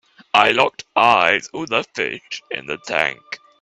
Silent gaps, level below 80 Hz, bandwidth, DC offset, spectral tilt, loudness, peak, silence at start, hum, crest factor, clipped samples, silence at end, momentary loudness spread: none; -62 dBFS; 11.5 kHz; under 0.1%; -3 dB/octave; -18 LUFS; 0 dBFS; 0.35 s; none; 20 dB; under 0.1%; 0.25 s; 14 LU